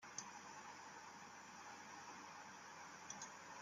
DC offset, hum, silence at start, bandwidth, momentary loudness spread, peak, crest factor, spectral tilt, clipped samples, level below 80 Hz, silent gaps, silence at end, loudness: under 0.1%; none; 0 s; 15.5 kHz; 4 LU; -32 dBFS; 24 dB; -1.5 dB/octave; under 0.1%; under -90 dBFS; none; 0 s; -55 LUFS